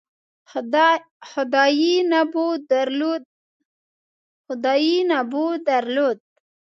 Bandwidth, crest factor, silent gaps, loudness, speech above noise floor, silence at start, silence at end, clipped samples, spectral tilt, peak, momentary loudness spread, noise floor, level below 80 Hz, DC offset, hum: 7.2 kHz; 18 dB; 1.11-1.20 s, 3.25-4.44 s; -20 LUFS; over 70 dB; 0.55 s; 0.6 s; under 0.1%; -3 dB/octave; -4 dBFS; 13 LU; under -90 dBFS; -80 dBFS; under 0.1%; none